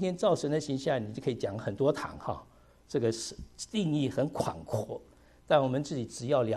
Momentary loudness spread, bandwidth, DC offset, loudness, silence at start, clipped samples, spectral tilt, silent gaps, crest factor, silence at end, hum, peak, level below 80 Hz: 11 LU; 13 kHz; under 0.1%; -32 LUFS; 0 s; under 0.1%; -6 dB/octave; none; 20 dB; 0 s; none; -12 dBFS; -58 dBFS